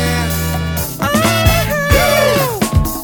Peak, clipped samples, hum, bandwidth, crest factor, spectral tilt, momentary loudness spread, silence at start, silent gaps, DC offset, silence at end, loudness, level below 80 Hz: 0 dBFS; under 0.1%; none; 19.5 kHz; 14 dB; -4.5 dB/octave; 7 LU; 0 s; none; under 0.1%; 0 s; -14 LUFS; -24 dBFS